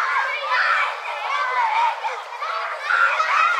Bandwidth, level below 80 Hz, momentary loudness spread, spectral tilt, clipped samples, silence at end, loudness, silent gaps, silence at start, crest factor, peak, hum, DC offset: 14 kHz; under -90 dBFS; 9 LU; 6 dB/octave; under 0.1%; 0 s; -21 LUFS; none; 0 s; 16 dB; -6 dBFS; none; under 0.1%